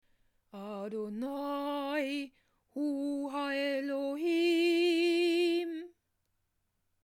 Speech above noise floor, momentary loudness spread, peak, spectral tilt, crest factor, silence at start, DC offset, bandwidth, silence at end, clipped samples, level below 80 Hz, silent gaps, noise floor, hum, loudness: 45 dB; 16 LU; -20 dBFS; -4 dB/octave; 14 dB; 0.55 s; under 0.1%; 15.5 kHz; 1.15 s; under 0.1%; -80 dBFS; none; -80 dBFS; none; -32 LUFS